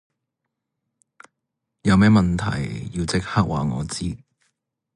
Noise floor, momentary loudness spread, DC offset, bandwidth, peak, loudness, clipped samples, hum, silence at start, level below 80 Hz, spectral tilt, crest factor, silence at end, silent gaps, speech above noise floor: -81 dBFS; 13 LU; under 0.1%; 11 kHz; -6 dBFS; -21 LUFS; under 0.1%; none; 1.85 s; -40 dBFS; -6 dB/octave; 18 dB; 0.8 s; none; 61 dB